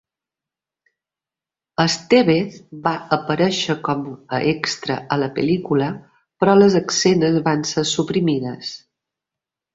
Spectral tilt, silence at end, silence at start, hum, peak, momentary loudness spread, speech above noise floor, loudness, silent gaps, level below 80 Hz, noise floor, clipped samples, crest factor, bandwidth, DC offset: -5 dB/octave; 0.95 s; 1.8 s; none; -2 dBFS; 11 LU; 71 dB; -19 LUFS; none; -58 dBFS; -89 dBFS; under 0.1%; 18 dB; 8 kHz; under 0.1%